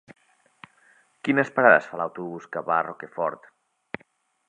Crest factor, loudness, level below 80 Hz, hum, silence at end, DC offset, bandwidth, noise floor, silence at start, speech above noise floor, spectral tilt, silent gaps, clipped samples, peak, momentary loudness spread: 24 dB; -23 LUFS; -76 dBFS; none; 1.1 s; under 0.1%; 9.8 kHz; -63 dBFS; 1.25 s; 40 dB; -6.5 dB/octave; none; under 0.1%; -2 dBFS; 22 LU